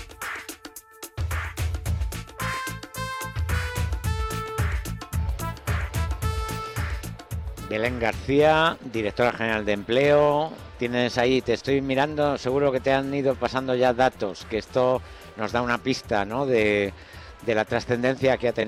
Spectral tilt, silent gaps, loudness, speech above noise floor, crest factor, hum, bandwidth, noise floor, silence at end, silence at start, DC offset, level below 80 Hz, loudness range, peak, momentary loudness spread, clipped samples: -5.5 dB/octave; none; -25 LUFS; 21 dB; 14 dB; none; 16 kHz; -44 dBFS; 0 s; 0 s; under 0.1%; -38 dBFS; 7 LU; -10 dBFS; 12 LU; under 0.1%